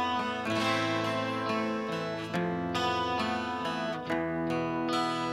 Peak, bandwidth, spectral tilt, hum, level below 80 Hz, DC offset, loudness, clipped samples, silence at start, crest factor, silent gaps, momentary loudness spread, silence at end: -16 dBFS; 14.5 kHz; -5 dB/octave; none; -62 dBFS; under 0.1%; -31 LUFS; under 0.1%; 0 s; 14 dB; none; 4 LU; 0 s